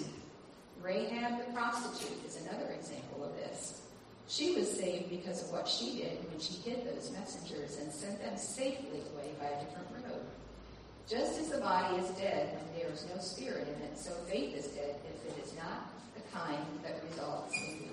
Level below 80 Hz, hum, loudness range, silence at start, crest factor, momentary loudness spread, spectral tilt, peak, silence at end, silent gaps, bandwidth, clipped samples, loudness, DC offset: -66 dBFS; none; 5 LU; 0 s; 20 dB; 11 LU; -3.5 dB/octave; -20 dBFS; 0 s; none; 11.5 kHz; under 0.1%; -40 LUFS; under 0.1%